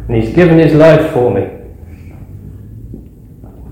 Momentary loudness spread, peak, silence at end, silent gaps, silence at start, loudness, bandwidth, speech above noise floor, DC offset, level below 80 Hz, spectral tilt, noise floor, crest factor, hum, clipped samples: 26 LU; 0 dBFS; 0 s; none; 0 s; -9 LUFS; 14 kHz; 26 dB; under 0.1%; -32 dBFS; -8.5 dB/octave; -34 dBFS; 12 dB; none; 1%